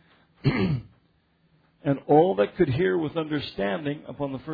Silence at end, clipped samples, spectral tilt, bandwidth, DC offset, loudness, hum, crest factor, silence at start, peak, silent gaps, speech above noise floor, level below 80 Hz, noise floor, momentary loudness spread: 0 s; under 0.1%; -10 dB/octave; 5 kHz; under 0.1%; -25 LUFS; none; 18 dB; 0.45 s; -8 dBFS; none; 41 dB; -52 dBFS; -65 dBFS; 13 LU